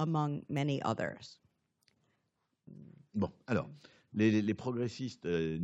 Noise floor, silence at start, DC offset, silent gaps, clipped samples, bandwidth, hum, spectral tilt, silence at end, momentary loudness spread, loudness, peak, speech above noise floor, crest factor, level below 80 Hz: -82 dBFS; 0 s; under 0.1%; none; under 0.1%; 8 kHz; none; -7 dB/octave; 0 s; 21 LU; -35 LUFS; -16 dBFS; 48 dB; 20 dB; -70 dBFS